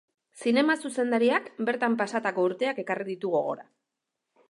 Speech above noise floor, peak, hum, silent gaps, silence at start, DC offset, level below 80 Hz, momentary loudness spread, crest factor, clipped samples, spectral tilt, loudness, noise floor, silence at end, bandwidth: 58 dB; -10 dBFS; none; none; 0.35 s; under 0.1%; -82 dBFS; 8 LU; 18 dB; under 0.1%; -5 dB/octave; -27 LUFS; -85 dBFS; 0.85 s; 11.5 kHz